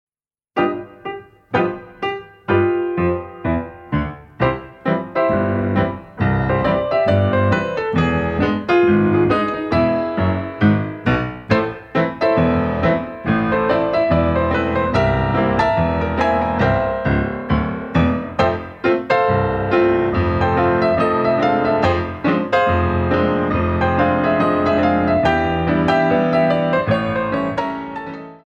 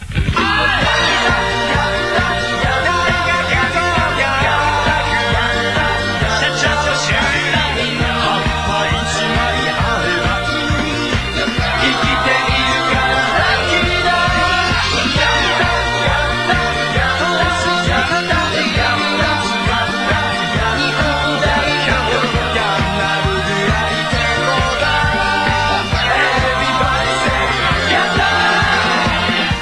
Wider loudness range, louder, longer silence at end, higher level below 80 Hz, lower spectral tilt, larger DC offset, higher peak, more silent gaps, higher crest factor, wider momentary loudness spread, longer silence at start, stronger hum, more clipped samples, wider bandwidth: about the same, 4 LU vs 2 LU; second, -18 LUFS vs -14 LUFS; about the same, 0.1 s vs 0 s; second, -36 dBFS vs -28 dBFS; first, -8.5 dB/octave vs -4 dB/octave; second, under 0.1% vs 0.2%; about the same, -2 dBFS vs -4 dBFS; neither; about the same, 16 dB vs 12 dB; first, 7 LU vs 3 LU; first, 0.55 s vs 0 s; neither; neither; second, 8 kHz vs 11 kHz